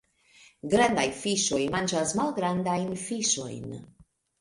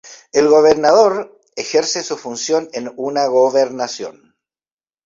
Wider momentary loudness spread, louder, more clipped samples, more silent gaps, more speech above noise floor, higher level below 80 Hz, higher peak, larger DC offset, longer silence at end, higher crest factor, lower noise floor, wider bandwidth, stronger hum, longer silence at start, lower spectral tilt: about the same, 15 LU vs 16 LU; second, -27 LUFS vs -15 LUFS; neither; neither; second, 31 dB vs over 75 dB; about the same, -58 dBFS vs -60 dBFS; second, -8 dBFS vs 0 dBFS; neither; second, 0.55 s vs 0.95 s; about the same, 20 dB vs 16 dB; second, -58 dBFS vs under -90 dBFS; first, 11.5 kHz vs 7.8 kHz; neither; first, 0.65 s vs 0.05 s; about the same, -3.5 dB/octave vs -3 dB/octave